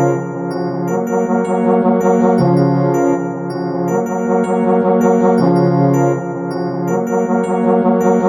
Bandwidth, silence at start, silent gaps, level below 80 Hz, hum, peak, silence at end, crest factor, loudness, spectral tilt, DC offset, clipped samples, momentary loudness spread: 14.5 kHz; 0 s; none; -56 dBFS; none; -2 dBFS; 0 s; 12 dB; -15 LUFS; -8.5 dB/octave; under 0.1%; under 0.1%; 8 LU